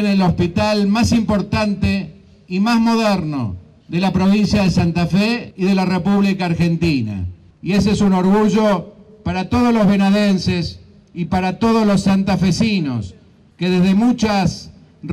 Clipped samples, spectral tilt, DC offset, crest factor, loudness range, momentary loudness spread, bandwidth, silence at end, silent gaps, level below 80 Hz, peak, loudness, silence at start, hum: under 0.1%; -6.5 dB/octave; under 0.1%; 8 dB; 2 LU; 11 LU; 11.5 kHz; 0 s; none; -38 dBFS; -8 dBFS; -16 LUFS; 0 s; none